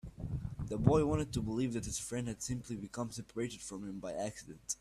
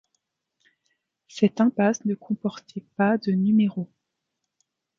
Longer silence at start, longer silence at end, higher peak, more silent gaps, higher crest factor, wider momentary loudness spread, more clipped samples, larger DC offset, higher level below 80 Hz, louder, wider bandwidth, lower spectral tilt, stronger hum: second, 0.05 s vs 1.35 s; second, 0.05 s vs 1.15 s; second, -12 dBFS vs -6 dBFS; neither; about the same, 24 dB vs 20 dB; second, 13 LU vs 17 LU; neither; neither; first, -52 dBFS vs -72 dBFS; second, -37 LUFS vs -23 LUFS; first, 14.5 kHz vs 7.2 kHz; about the same, -5.5 dB/octave vs -6.5 dB/octave; neither